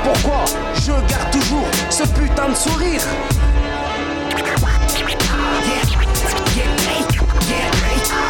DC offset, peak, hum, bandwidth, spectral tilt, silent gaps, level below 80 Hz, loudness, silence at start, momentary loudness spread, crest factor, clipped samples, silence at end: under 0.1%; -6 dBFS; none; 18.5 kHz; -4 dB/octave; none; -20 dBFS; -17 LUFS; 0 s; 3 LU; 10 dB; under 0.1%; 0 s